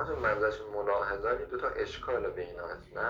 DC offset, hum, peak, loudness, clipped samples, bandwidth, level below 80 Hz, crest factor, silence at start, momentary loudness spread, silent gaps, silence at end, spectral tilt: under 0.1%; none; -16 dBFS; -33 LUFS; under 0.1%; 7.4 kHz; -52 dBFS; 16 dB; 0 s; 10 LU; none; 0 s; -6 dB/octave